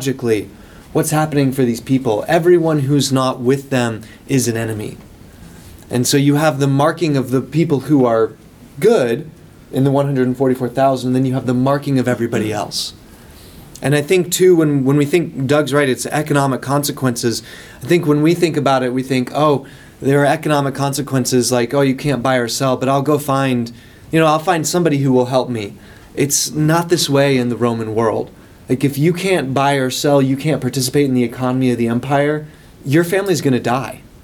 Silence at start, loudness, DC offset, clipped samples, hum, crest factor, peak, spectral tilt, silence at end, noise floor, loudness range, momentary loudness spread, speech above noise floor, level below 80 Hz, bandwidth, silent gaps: 0 s; -16 LUFS; under 0.1%; under 0.1%; none; 14 dB; -2 dBFS; -5.5 dB/octave; 0.15 s; -39 dBFS; 2 LU; 8 LU; 24 dB; -48 dBFS; 19 kHz; none